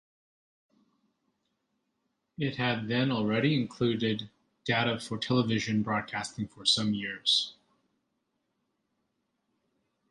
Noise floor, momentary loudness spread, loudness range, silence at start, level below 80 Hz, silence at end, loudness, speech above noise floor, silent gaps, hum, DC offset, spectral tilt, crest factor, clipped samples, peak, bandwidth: -80 dBFS; 9 LU; 5 LU; 2.4 s; -66 dBFS; 2.6 s; -29 LUFS; 51 dB; none; none; under 0.1%; -4.5 dB/octave; 20 dB; under 0.1%; -12 dBFS; 11.5 kHz